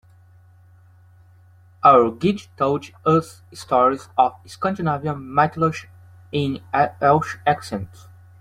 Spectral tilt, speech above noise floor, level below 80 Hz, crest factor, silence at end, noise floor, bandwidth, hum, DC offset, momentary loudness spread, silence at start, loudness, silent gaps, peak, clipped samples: -6.5 dB/octave; 31 dB; -58 dBFS; 20 dB; 0.55 s; -50 dBFS; 14.5 kHz; none; under 0.1%; 12 LU; 1.85 s; -20 LUFS; none; -2 dBFS; under 0.1%